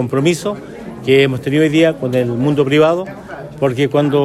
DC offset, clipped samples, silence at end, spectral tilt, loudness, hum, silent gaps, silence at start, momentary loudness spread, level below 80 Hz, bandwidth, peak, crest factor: under 0.1%; under 0.1%; 0 s; -6.5 dB/octave; -15 LUFS; none; none; 0 s; 16 LU; -50 dBFS; 13.5 kHz; 0 dBFS; 14 dB